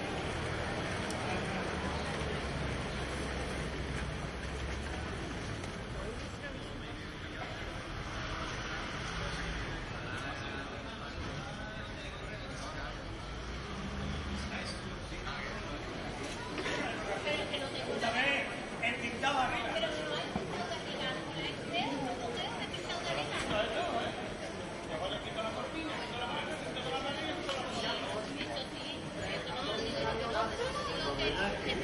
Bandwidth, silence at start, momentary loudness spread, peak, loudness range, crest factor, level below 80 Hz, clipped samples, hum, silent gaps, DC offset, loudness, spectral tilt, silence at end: 11.5 kHz; 0 s; 8 LU; -18 dBFS; 7 LU; 20 dB; -48 dBFS; under 0.1%; none; none; under 0.1%; -37 LUFS; -4.5 dB/octave; 0 s